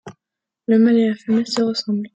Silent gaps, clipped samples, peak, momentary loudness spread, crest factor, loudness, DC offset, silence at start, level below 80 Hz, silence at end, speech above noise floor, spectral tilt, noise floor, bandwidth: none; under 0.1%; -6 dBFS; 8 LU; 14 dB; -18 LUFS; under 0.1%; 0.05 s; -68 dBFS; 0.1 s; 68 dB; -5.5 dB/octave; -85 dBFS; 8.2 kHz